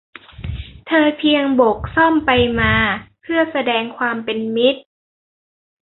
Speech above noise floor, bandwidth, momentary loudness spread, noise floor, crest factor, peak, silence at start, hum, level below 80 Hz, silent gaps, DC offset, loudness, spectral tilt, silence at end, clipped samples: over 74 dB; 4.2 kHz; 15 LU; under -90 dBFS; 18 dB; 0 dBFS; 0.4 s; none; -38 dBFS; none; under 0.1%; -16 LUFS; -10.5 dB/octave; 1.05 s; under 0.1%